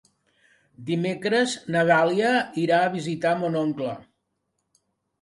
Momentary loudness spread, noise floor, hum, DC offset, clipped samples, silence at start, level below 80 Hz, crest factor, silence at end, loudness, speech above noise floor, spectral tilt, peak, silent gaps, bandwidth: 11 LU; -77 dBFS; none; under 0.1%; under 0.1%; 0.8 s; -68 dBFS; 18 dB; 1.2 s; -23 LUFS; 54 dB; -5.5 dB/octave; -8 dBFS; none; 11.5 kHz